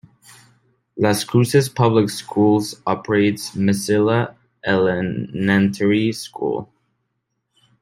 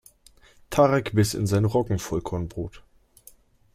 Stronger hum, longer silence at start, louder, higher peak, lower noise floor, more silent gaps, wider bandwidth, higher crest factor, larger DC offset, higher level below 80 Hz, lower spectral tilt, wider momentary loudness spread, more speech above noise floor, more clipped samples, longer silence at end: neither; first, 0.95 s vs 0.7 s; first, -19 LUFS vs -24 LUFS; first, -2 dBFS vs -6 dBFS; first, -74 dBFS vs -55 dBFS; neither; about the same, 16 kHz vs 15.5 kHz; about the same, 18 dB vs 20 dB; neither; second, -58 dBFS vs -48 dBFS; about the same, -6 dB/octave vs -6 dB/octave; second, 8 LU vs 13 LU; first, 56 dB vs 32 dB; neither; first, 1.15 s vs 0.95 s